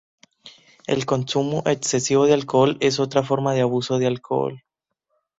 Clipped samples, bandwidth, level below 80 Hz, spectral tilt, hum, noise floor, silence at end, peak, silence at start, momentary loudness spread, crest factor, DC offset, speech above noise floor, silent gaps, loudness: under 0.1%; 8.2 kHz; -60 dBFS; -5 dB/octave; none; -74 dBFS; 0.8 s; -4 dBFS; 0.45 s; 7 LU; 18 dB; under 0.1%; 53 dB; none; -21 LUFS